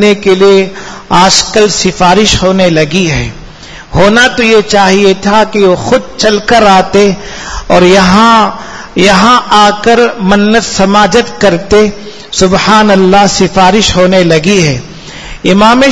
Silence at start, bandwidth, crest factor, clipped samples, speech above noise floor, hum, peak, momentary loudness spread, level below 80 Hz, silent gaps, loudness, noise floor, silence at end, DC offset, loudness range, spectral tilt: 0 s; 11 kHz; 6 dB; 5%; 22 dB; none; 0 dBFS; 10 LU; -28 dBFS; none; -6 LUFS; -28 dBFS; 0 s; under 0.1%; 1 LU; -4 dB/octave